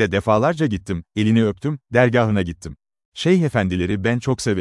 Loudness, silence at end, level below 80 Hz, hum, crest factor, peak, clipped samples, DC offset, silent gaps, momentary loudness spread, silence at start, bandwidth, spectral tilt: -19 LUFS; 0 s; -48 dBFS; none; 18 dB; -2 dBFS; under 0.1%; under 0.1%; 3.05-3.12 s; 10 LU; 0 s; 12 kHz; -6.5 dB/octave